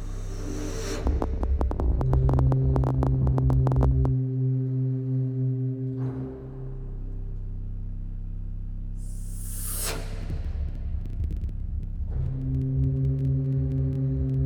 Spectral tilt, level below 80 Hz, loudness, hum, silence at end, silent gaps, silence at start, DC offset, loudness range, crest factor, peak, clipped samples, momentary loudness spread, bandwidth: -7.5 dB/octave; -30 dBFS; -28 LUFS; none; 0 s; none; 0 s; under 0.1%; 11 LU; 18 dB; -8 dBFS; under 0.1%; 15 LU; 19 kHz